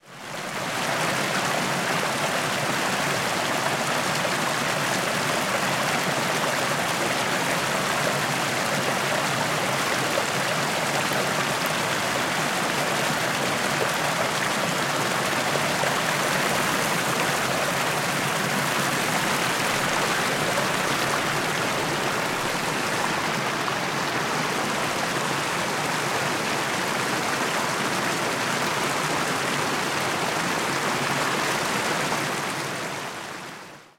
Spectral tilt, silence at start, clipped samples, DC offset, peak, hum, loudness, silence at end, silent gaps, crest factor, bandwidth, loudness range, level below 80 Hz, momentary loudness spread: -2.5 dB/octave; 0.05 s; under 0.1%; under 0.1%; -10 dBFS; none; -24 LUFS; 0.15 s; none; 16 dB; 16.5 kHz; 2 LU; -60 dBFS; 2 LU